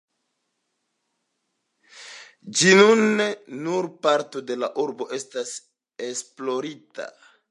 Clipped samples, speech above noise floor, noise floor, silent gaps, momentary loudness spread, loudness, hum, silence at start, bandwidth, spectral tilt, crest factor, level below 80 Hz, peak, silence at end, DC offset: under 0.1%; 54 dB; -76 dBFS; none; 23 LU; -22 LUFS; none; 1.95 s; 11.5 kHz; -3.5 dB/octave; 22 dB; -80 dBFS; -2 dBFS; 0.4 s; under 0.1%